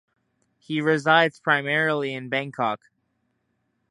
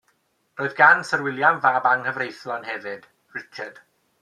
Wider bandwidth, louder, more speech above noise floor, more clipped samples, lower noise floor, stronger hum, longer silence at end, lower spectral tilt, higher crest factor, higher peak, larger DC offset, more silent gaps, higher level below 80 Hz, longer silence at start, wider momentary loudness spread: about the same, 11.5 kHz vs 12 kHz; second, -23 LUFS vs -20 LUFS; first, 50 dB vs 46 dB; neither; first, -73 dBFS vs -67 dBFS; neither; first, 1.15 s vs 0.5 s; about the same, -5.5 dB/octave vs -4.5 dB/octave; about the same, 22 dB vs 22 dB; about the same, -2 dBFS vs 0 dBFS; neither; neither; about the same, -76 dBFS vs -76 dBFS; first, 0.7 s vs 0.55 s; second, 9 LU vs 21 LU